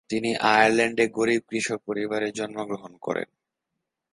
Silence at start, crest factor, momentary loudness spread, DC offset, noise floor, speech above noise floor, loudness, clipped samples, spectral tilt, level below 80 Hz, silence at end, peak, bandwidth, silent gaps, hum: 0.1 s; 22 dB; 14 LU; under 0.1%; -83 dBFS; 59 dB; -24 LUFS; under 0.1%; -4 dB/octave; -68 dBFS; 0.9 s; -4 dBFS; 11.5 kHz; none; none